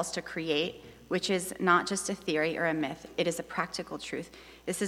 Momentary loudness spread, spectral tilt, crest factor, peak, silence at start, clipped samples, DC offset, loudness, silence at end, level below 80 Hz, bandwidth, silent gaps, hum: 12 LU; -3.5 dB/octave; 22 dB; -10 dBFS; 0 s; under 0.1%; under 0.1%; -31 LUFS; 0 s; -64 dBFS; 16.5 kHz; none; none